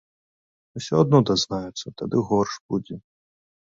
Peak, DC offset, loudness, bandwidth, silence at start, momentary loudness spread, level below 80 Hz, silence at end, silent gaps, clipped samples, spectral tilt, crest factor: -4 dBFS; under 0.1%; -23 LUFS; 7.8 kHz; 0.75 s; 20 LU; -56 dBFS; 0.65 s; 2.60-2.69 s; under 0.1%; -6 dB/octave; 20 dB